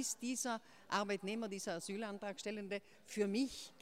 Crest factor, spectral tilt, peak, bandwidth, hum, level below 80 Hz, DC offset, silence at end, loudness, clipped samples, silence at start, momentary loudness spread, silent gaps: 20 dB; -3.5 dB/octave; -22 dBFS; 16 kHz; none; -78 dBFS; under 0.1%; 0.1 s; -42 LUFS; under 0.1%; 0 s; 7 LU; none